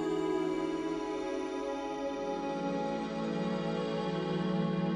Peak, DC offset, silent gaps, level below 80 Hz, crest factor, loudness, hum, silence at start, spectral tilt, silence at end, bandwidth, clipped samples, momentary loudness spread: -22 dBFS; under 0.1%; none; -62 dBFS; 12 dB; -34 LUFS; none; 0 s; -7 dB/octave; 0 s; 11 kHz; under 0.1%; 4 LU